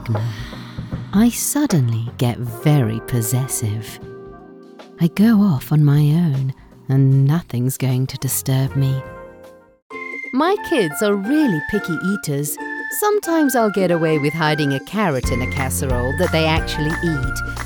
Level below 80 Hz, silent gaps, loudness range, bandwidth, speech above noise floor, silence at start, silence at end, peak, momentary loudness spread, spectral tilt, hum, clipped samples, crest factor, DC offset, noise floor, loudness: -36 dBFS; 9.82-9.90 s; 4 LU; 19 kHz; 26 dB; 0 s; 0 s; -4 dBFS; 13 LU; -6 dB/octave; none; under 0.1%; 16 dB; under 0.1%; -43 dBFS; -19 LUFS